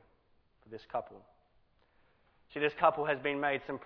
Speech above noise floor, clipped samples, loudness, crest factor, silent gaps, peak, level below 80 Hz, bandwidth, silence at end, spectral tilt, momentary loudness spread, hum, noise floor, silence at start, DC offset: 36 dB; under 0.1%; -33 LUFS; 24 dB; none; -12 dBFS; -70 dBFS; 5.4 kHz; 0 s; -2.5 dB/octave; 22 LU; none; -70 dBFS; 0.7 s; under 0.1%